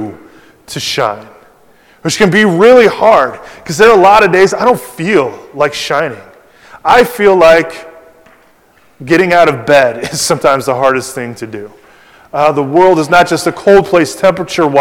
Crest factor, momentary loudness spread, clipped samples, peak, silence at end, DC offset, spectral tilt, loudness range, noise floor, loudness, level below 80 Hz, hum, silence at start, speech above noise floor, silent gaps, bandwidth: 10 dB; 16 LU; 3%; 0 dBFS; 0 s; under 0.1%; -4.5 dB/octave; 4 LU; -47 dBFS; -9 LUFS; -44 dBFS; none; 0 s; 38 dB; none; 18 kHz